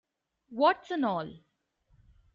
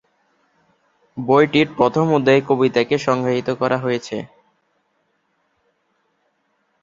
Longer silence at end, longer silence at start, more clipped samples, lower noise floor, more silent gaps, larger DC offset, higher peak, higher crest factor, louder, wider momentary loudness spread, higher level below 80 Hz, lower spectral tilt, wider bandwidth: second, 1 s vs 2.55 s; second, 0.5 s vs 1.15 s; neither; about the same, -70 dBFS vs -67 dBFS; neither; neither; second, -10 dBFS vs 0 dBFS; about the same, 22 dB vs 20 dB; second, -29 LUFS vs -18 LUFS; first, 18 LU vs 15 LU; second, -70 dBFS vs -58 dBFS; second, -3 dB/octave vs -6.5 dB/octave; about the same, 7.4 kHz vs 7.6 kHz